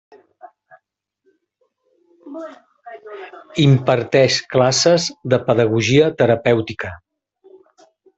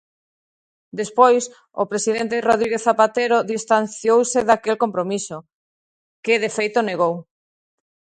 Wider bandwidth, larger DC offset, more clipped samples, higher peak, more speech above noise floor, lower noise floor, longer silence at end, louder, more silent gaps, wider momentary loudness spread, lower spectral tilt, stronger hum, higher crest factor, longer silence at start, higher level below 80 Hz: second, 8.2 kHz vs 10.5 kHz; neither; neither; about the same, -2 dBFS vs 0 dBFS; second, 53 dB vs over 71 dB; second, -70 dBFS vs under -90 dBFS; first, 1.2 s vs 0.8 s; first, -16 LUFS vs -19 LUFS; second, none vs 5.54-6.23 s; first, 21 LU vs 13 LU; first, -5 dB/octave vs -3.5 dB/octave; neither; about the same, 18 dB vs 20 dB; second, 0.45 s vs 0.95 s; first, -56 dBFS vs -64 dBFS